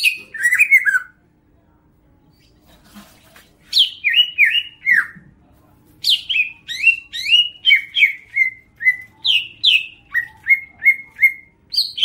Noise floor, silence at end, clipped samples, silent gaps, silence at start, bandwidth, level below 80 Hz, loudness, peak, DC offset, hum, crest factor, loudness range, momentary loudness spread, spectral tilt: -56 dBFS; 0 s; under 0.1%; none; 0 s; 16 kHz; -60 dBFS; -15 LUFS; -2 dBFS; under 0.1%; none; 16 dB; 4 LU; 9 LU; 2 dB/octave